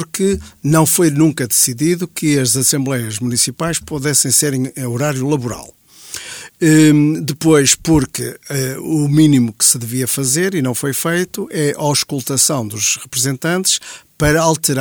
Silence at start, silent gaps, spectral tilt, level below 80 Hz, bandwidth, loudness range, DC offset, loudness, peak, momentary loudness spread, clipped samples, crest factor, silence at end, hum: 0 s; none; -4 dB/octave; -42 dBFS; over 20 kHz; 3 LU; under 0.1%; -14 LUFS; 0 dBFS; 10 LU; under 0.1%; 16 dB; 0 s; none